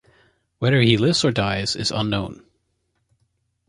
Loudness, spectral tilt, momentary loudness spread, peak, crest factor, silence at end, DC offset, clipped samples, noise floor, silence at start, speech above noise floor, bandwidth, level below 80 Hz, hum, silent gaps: -20 LUFS; -5 dB/octave; 9 LU; -2 dBFS; 20 dB; 1.35 s; under 0.1%; under 0.1%; -71 dBFS; 0.6 s; 51 dB; 11.5 kHz; -48 dBFS; none; none